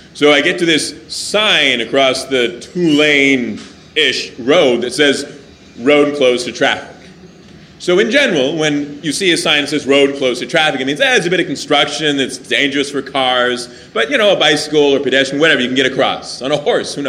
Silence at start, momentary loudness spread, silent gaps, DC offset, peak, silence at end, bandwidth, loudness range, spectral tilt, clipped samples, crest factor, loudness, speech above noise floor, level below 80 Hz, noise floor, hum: 0.15 s; 8 LU; none; under 0.1%; 0 dBFS; 0 s; 15 kHz; 2 LU; -3 dB/octave; under 0.1%; 14 dB; -13 LUFS; 25 dB; -54 dBFS; -39 dBFS; none